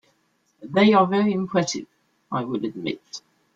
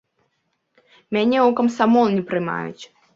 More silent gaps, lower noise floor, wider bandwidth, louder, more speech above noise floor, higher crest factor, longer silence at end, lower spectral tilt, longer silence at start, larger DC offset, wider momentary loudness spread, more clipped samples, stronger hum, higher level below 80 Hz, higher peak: neither; second, -67 dBFS vs -71 dBFS; about the same, 7.8 kHz vs 7.6 kHz; second, -22 LUFS vs -19 LUFS; second, 46 dB vs 53 dB; about the same, 18 dB vs 18 dB; about the same, 0.35 s vs 0.3 s; about the same, -5.5 dB/octave vs -6.5 dB/octave; second, 0.6 s vs 1.1 s; neither; first, 17 LU vs 10 LU; neither; neither; about the same, -66 dBFS vs -66 dBFS; about the same, -6 dBFS vs -4 dBFS